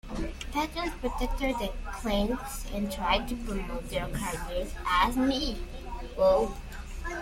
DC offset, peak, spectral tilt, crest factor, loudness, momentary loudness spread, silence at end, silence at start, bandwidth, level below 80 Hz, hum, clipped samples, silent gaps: under 0.1%; -12 dBFS; -4.5 dB/octave; 18 dB; -30 LUFS; 13 LU; 0 s; 0.05 s; 16.5 kHz; -38 dBFS; none; under 0.1%; none